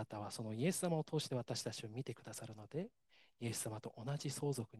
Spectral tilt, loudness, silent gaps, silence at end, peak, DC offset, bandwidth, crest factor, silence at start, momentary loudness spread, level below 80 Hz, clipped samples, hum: -5 dB/octave; -43 LUFS; none; 0 s; -24 dBFS; under 0.1%; 12.5 kHz; 18 dB; 0 s; 9 LU; -78 dBFS; under 0.1%; none